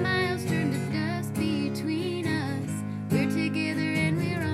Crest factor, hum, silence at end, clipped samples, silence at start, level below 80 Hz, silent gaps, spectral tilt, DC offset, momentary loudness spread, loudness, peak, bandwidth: 14 dB; none; 0 s; under 0.1%; 0 s; -58 dBFS; none; -6 dB/octave; under 0.1%; 4 LU; -28 LUFS; -14 dBFS; 15.5 kHz